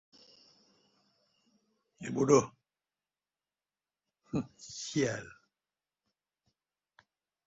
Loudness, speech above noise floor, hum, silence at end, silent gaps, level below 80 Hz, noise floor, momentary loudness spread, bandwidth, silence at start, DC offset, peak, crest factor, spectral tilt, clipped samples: -32 LUFS; over 59 dB; none; 2.2 s; none; -72 dBFS; under -90 dBFS; 19 LU; 7.6 kHz; 2 s; under 0.1%; -12 dBFS; 26 dB; -5.5 dB/octave; under 0.1%